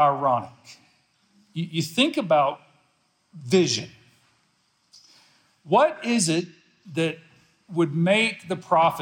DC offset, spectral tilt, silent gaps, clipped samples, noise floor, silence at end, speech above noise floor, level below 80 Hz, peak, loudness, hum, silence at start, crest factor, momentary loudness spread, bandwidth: under 0.1%; -4.5 dB/octave; none; under 0.1%; -67 dBFS; 0 s; 45 dB; -72 dBFS; -6 dBFS; -23 LUFS; none; 0 s; 18 dB; 19 LU; 17.5 kHz